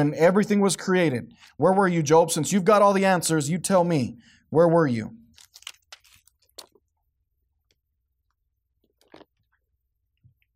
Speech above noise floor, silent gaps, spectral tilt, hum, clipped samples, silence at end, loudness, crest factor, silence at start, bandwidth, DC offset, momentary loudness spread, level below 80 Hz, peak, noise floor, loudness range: 56 dB; none; -5.5 dB/octave; none; under 0.1%; 5.4 s; -21 LUFS; 16 dB; 0 s; 16 kHz; under 0.1%; 14 LU; -66 dBFS; -8 dBFS; -77 dBFS; 7 LU